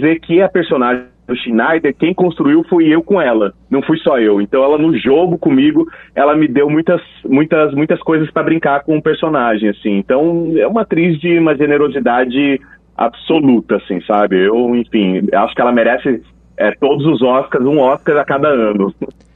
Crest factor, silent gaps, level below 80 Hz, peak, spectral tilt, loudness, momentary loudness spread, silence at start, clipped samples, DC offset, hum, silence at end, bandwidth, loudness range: 12 dB; none; -48 dBFS; 0 dBFS; -9.5 dB/octave; -13 LUFS; 6 LU; 0 s; under 0.1%; under 0.1%; none; 0.25 s; 4.1 kHz; 2 LU